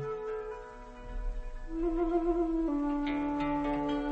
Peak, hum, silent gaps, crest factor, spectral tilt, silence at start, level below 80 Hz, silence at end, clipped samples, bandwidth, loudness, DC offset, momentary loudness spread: -20 dBFS; none; none; 14 dB; -7.5 dB/octave; 0 s; -42 dBFS; 0 s; under 0.1%; 8 kHz; -33 LUFS; under 0.1%; 15 LU